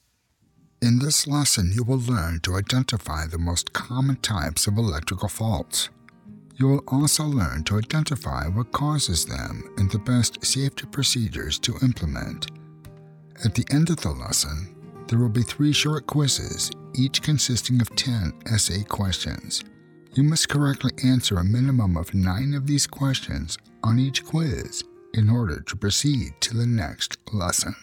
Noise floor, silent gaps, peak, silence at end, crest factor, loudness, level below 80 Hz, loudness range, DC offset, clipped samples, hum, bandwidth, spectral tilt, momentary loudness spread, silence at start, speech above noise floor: -66 dBFS; none; -6 dBFS; 0.05 s; 18 dB; -23 LUFS; -40 dBFS; 3 LU; under 0.1%; under 0.1%; none; 18 kHz; -4 dB/octave; 8 LU; 0.8 s; 43 dB